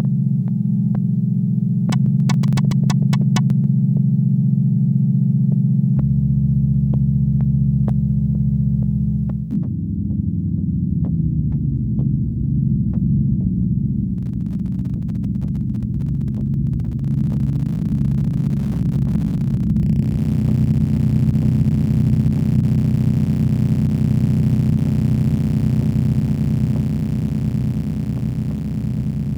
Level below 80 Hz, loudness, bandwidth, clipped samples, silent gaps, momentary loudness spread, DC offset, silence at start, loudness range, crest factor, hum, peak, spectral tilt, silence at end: -32 dBFS; -19 LUFS; 8.4 kHz; under 0.1%; none; 6 LU; under 0.1%; 0 s; 4 LU; 14 dB; none; -4 dBFS; -9 dB/octave; 0 s